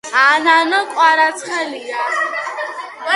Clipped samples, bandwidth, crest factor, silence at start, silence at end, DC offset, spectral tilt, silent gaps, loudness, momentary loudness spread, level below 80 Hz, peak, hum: under 0.1%; 11.5 kHz; 16 dB; 0.05 s; 0 s; under 0.1%; -0.5 dB/octave; none; -15 LUFS; 13 LU; -74 dBFS; 0 dBFS; none